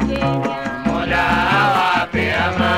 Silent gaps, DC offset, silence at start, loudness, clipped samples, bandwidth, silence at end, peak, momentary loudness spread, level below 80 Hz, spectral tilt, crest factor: none; 0.2%; 0 s; -17 LUFS; under 0.1%; 16 kHz; 0 s; -4 dBFS; 6 LU; -36 dBFS; -5.5 dB/octave; 12 dB